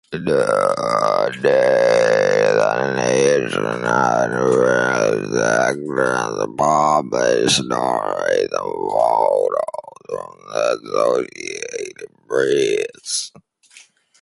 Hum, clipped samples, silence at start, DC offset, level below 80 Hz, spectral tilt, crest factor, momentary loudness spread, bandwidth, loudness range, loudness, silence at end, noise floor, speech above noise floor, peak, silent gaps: none; under 0.1%; 0.1 s; under 0.1%; -58 dBFS; -4 dB/octave; 18 dB; 12 LU; 11.5 kHz; 5 LU; -18 LUFS; 0.4 s; -49 dBFS; 31 dB; 0 dBFS; none